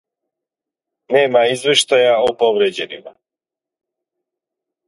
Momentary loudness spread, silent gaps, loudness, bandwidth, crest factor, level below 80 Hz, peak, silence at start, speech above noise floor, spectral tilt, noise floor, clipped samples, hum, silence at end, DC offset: 13 LU; none; -14 LUFS; 11.5 kHz; 18 dB; -64 dBFS; 0 dBFS; 1.1 s; 73 dB; -2.5 dB/octave; -88 dBFS; under 0.1%; none; 1.8 s; under 0.1%